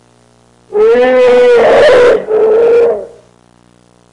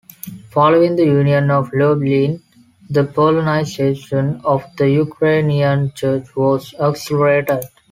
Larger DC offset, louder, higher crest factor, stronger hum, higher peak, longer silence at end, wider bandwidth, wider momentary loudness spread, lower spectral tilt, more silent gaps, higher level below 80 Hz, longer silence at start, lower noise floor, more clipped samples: neither; first, -7 LUFS vs -16 LUFS; second, 6 dB vs 14 dB; first, 60 Hz at -50 dBFS vs none; about the same, -2 dBFS vs -2 dBFS; first, 1.05 s vs 0.25 s; second, 10.5 kHz vs 15.5 kHz; about the same, 7 LU vs 7 LU; second, -4.5 dB/octave vs -7.5 dB/octave; neither; first, -44 dBFS vs -52 dBFS; first, 0.7 s vs 0.25 s; first, -46 dBFS vs -34 dBFS; neither